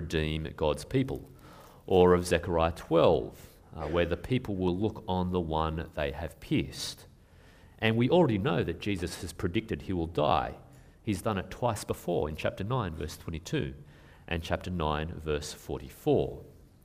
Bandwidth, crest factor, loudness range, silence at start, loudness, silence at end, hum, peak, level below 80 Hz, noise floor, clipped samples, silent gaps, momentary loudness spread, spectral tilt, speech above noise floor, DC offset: 15.5 kHz; 22 dB; 6 LU; 0 s; -30 LUFS; 0.25 s; none; -8 dBFS; -46 dBFS; -56 dBFS; under 0.1%; none; 15 LU; -6 dB/octave; 27 dB; under 0.1%